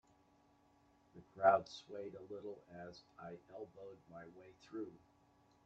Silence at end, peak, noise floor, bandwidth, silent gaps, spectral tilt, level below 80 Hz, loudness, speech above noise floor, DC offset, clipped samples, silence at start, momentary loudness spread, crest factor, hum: 0.7 s; -18 dBFS; -72 dBFS; 7.8 kHz; none; -5.5 dB/octave; -82 dBFS; -40 LUFS; 30 dB; under 0.1%; under 0.1%; 1.15 s; 24 LU; 26 dB; none